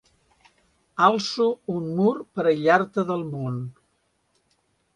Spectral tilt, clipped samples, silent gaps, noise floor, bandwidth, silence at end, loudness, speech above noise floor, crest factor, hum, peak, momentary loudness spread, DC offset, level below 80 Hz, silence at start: -6 dB/octave; under 0.1%; none; -70 dBFS; 10.5 kHz; 1.25 s; -23 LUFS; 47 dB; 22 dB; none; -4 dBFS; 11 LU; under 0.1%; -66 dBFS; 0.95 s